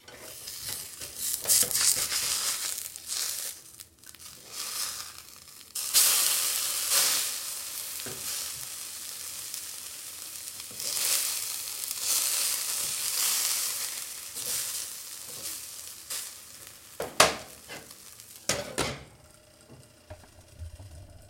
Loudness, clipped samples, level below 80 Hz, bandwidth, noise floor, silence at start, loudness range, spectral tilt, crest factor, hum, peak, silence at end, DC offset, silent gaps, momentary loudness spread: -28 LUFS; under 0.1%; -62 dBFS; 17 kHz; -55 dBFS; 0.05 s; 10 LU; 0.5 dB/octave; 30 dB; none; -2 dBFS; 0 s; under 0.1%; none; 22 LU